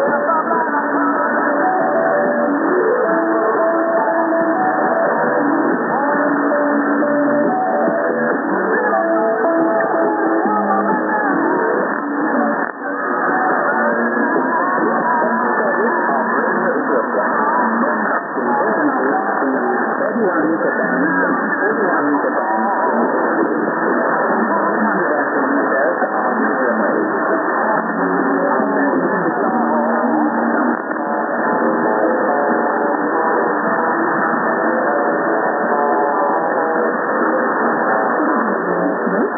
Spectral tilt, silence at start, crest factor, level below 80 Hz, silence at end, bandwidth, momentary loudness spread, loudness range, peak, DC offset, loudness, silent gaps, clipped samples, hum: -14.5 dB/octave; 0 s; 14 dB; -78 dBFS; 0 s; 2 kHz; 2 LU; 1 LU; -2 dBFS; under 0.1%; -16 LUFS; none; under 0.1%; none